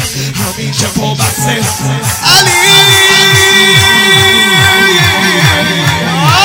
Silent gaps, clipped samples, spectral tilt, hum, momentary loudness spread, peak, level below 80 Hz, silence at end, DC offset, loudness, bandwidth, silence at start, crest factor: none; 3%; -2.5 dB/octave; none; 10 LU; 0 dBFS; -36 dBFS; 0 s; under 0.1%; -6 LUFS; over 20 kHz; 0 s; 8 dB